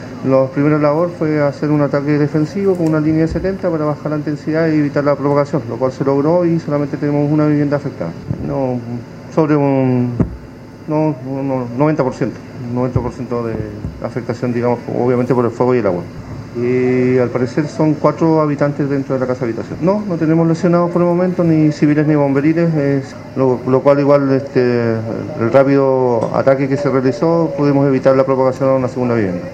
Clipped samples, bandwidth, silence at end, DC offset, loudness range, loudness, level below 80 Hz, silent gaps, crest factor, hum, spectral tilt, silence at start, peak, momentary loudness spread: under 0.1%; 8.4 kHz; 0 s; under 0.1%; 5 LU; -15 LUFS; -42 dBFS; none; 14 dB; none; -9 dB/octave; 0 s; 0 dBFS; 9 LU